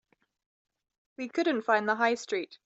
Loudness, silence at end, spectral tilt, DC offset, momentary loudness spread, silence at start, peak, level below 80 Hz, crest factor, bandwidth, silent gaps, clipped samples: -28 LUFS; 0.1 s; -3.5 dB/octave; under 0.1%; 9 LU; 1.2 s; -12 dBFS; -82 dBFS; 20 dB; 8.2 kHz; none; under 0.1%